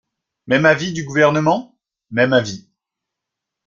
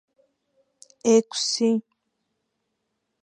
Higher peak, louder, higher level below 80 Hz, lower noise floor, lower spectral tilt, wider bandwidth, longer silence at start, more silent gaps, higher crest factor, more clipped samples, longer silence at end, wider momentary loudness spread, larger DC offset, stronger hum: first, -2 dBFS vs -6 dBFS; first, -17 LUFS vs -22 LUFS; first, -58 dBFS vs -80 dBFS; first, -83 dBFS vs -78 dBFS; first, -5.5 dB/octave vs -3.5 dB/octave; second, 7.6 kHz vs 10.5 kHz; second, 0.45 s vs 1.05 s; neither; about the same, 18 dB vs 20 dB; neither; second, 1.05 s vs 1.45 s; first, 11 LU vs 8 LU; neither; neither